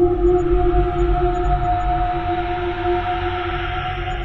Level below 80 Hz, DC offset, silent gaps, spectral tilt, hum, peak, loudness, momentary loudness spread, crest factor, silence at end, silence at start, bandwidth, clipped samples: -24 dBFS; under 0.1%; none; -8 dB/octave; none; -4 dBFS; -20 LUFS; 6 LU; 14 dB; 0 s; 0 s; 7.2 kHz; under 0.1%